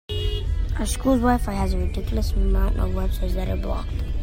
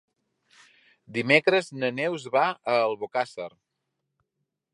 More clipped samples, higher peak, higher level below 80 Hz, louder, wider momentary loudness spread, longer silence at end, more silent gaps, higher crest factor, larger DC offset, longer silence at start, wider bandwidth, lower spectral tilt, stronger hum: neither; about the same, -6 dBFS vs -4 dBFS; first, -24 dBFS vs -78 dBFS; about the same, -25 LUFS vs -25 LUFS; second, 7 LU vs 13 LU; second, 0 s vs 1.25 s; neither; second, 16 dB vs 24 dB; neither; second, 0.1 s vs 1.1 s; first, 16.5 kHz vs 11.5 kHz; about the same, -6 dB/octave vs -5 dB/octave; neither